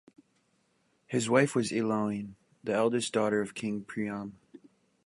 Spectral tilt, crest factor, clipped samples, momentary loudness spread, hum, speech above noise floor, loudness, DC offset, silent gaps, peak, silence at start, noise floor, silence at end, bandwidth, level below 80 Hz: -5 dB/octave; 22 dB; under 0.1%; 14 LU; none; 43 dB; -30 LUFS; under 0.1%; none; -10 dBFS; 1.1 s; -72 dBFS; 0.5 s; 11.5 kHz; -72 dBFS